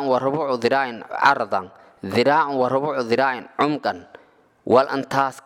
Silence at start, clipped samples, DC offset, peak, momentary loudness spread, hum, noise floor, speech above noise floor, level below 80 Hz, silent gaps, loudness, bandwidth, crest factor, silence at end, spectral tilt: 0 s; under 0.1%; under 0.1%; -2 dBFS; 9 LU; none; -55 dBFS; 34 dB; -66 dBFS; none; -21 LUFS; 15 kHz; 18 dB; 0.05 s; -5.5 dB/octave